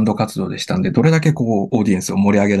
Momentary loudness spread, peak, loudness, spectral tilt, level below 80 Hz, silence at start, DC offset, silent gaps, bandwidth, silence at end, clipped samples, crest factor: 7 LU; -2 dBFS; -17 LUFS; -6.5 dB/octave; -50 dBFS; 0 s; under 0.1%; none; 12.5 kHz; 0 s; under 0.1%; 14 dB